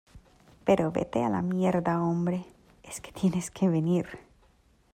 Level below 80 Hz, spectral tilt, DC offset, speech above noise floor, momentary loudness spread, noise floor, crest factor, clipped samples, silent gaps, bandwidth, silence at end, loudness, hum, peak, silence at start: -58 dBFS; -7 dB/octave; under 0.1%; 36 dB; 15 LU; -63 dBFS; 18 dB; under 0.1%; none; 14.5 kHz; 0.75 s; -28 LUFS; none; -10 dBFS; 0.15 s